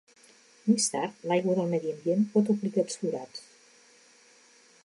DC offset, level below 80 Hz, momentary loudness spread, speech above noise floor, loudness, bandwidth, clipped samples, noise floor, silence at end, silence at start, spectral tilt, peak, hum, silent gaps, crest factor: under 0.1%; -82 dBFS; 9 LU; 32 dB; -28 LUFS; 11.5 kHz; under 0.1%; -59 dBFS; 1.45 s; 0.65 s; -5 dB/octave; -12 dBFS; none; none; 18 dB